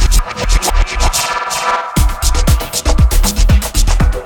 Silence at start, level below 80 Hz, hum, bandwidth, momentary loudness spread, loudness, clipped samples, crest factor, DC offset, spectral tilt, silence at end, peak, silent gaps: 0 s; -12 dBFS; none; 19 kHz; 3 LU; -14 LUFS; under 0.1%; 10 dB; under 0.1%; -3.5 dB/octave; 0 s; 0 dBFS; none